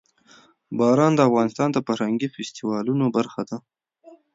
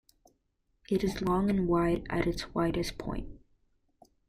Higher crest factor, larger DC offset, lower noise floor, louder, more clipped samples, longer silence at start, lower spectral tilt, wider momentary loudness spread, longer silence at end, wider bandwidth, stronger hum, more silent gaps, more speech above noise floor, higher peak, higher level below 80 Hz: about the same, 18 dB vs 18 dB; neither; second, -54 dBFS vs -76 dBFS; first, -22 LUFS vs -31 LUFS; neither; second, 0.7 s vs 0.9 s; about the same, -6.5 dB/octave vs -6.5 dB/octave; first, 14 LU vs 11 LU; second, 0.2 s vs 0.9 s; second, 7.8 kHz vs 15 kHz; neither; neither; second, 33 dB vs 46 dB; first, -4 dBFS vs -14 dBFS; second, -68 dBFS vs -46 dBFS